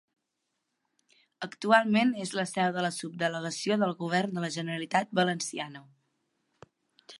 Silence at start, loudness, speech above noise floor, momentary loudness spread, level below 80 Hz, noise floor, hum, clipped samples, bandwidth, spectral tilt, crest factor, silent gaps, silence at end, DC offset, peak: 1.4 s; -29 LUFS; 53 dB; 11 LU; -80 dBFS; -82 dBFS; none; under 0.1%; 11.5 kHz; -4.5 dB/octave; 22 dB; none; 0 s; under 0.1%; -8 dBFS